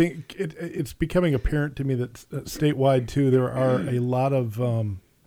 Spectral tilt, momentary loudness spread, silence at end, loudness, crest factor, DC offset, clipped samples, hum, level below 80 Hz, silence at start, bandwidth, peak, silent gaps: -7.5 dB/octave; 11 LU; 0.25 s; -25 LUFS; 16 dB; under 0.1%; under 0.1%; none; -40 dBFS; 0 s; 19 kHz; -8 dBFS; none